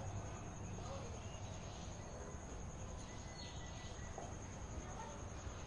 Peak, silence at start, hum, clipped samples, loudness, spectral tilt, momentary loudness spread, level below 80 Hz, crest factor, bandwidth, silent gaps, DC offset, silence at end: -36 dBFS; 0 s; none; under 0.1%; -50 LUFS; -4.5 dB/octave; 2 LU; -54 dBFS; 14 dB; 11 kHz; none; under 0.1%; 0 s